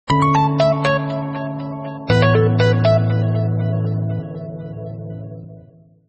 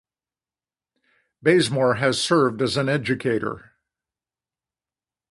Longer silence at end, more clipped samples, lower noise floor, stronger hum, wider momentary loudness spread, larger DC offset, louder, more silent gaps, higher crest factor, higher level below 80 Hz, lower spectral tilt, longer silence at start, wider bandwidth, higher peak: second, 0.5 s vs 1.7 s; neither; second, -46 dBFS vs under -90 dBFS; neither; first, 16 LU vs 7 LU; neither; first, -18 LUFS vs -21 LUFS; neither; second, 14 dB vs 20 dB; first, -44 dBFS vs -60 dBFS; first, -7.5 dB/octave vs -5 dB/octave; second, 0.05 s vs 1.45 s; second, 8.4 kHz vs 11.5 kHz; about the same, -4 dBFS vs -4 dBFS